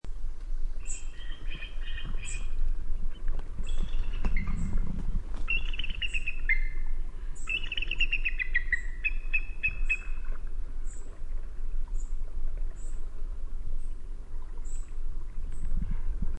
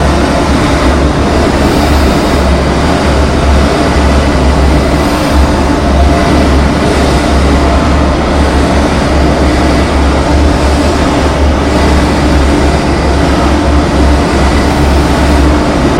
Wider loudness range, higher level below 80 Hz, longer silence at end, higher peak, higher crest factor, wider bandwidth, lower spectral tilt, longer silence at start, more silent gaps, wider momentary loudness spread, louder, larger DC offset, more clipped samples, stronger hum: first, 11 LU vs 0 LU; second, -30 dBFS vs -12 dBFS; about the same, 0 s vs 0 s; second, -14 dBFS vs 0 dBFS; first, 14 dB vs 8 dB; second, 8.6 kHz vs 15 kHz; second, -3.5 dB/octave vs -6 dB/octave; about the same, 0.05 s vs 0 s; neither; first, 14 LU vs 1 LU; second, -35 LUFS vs -9 LUFS; neither; second, under 0.1% vs 0.2%; neither